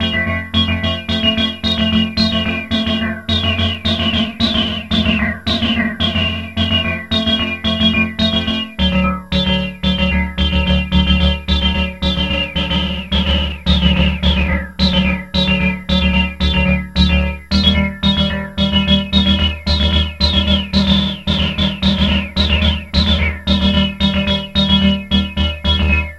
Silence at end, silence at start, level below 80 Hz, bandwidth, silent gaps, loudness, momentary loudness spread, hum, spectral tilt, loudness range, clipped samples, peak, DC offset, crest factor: 0 s; 0 s; -22 dBFS; 11.5 kHz; none; -15 LUFS; 4 LU; none; -6 dB/octave; 2 LU; under 0.1%; 0 dBFS; 0.3%; 16 dB